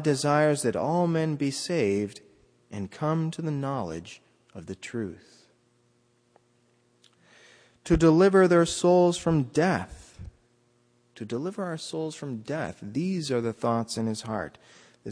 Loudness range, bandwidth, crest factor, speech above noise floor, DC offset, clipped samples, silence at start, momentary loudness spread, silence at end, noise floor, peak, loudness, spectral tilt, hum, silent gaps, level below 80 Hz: 16 LU; 10.5 kHz; 18 dB; 41 dB; under 0.1%; under 0.1%; 0 s; 20 LU; 0 s; -67 dBFS; -8 dBFS; -26 LUFS; -6 dB/octave; none; none; -50 dBFS